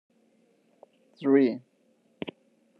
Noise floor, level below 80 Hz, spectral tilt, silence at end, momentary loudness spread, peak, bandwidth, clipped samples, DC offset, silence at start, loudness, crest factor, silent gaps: -67 dBFS; -82 dBFS; -8.5 dB/octave; 0.5 s; 18 LU; -10 dBFS; 5.2 kHz; under 0.1%; under 0.1%; 1.2 s; -25 LUFS; 20 dB; none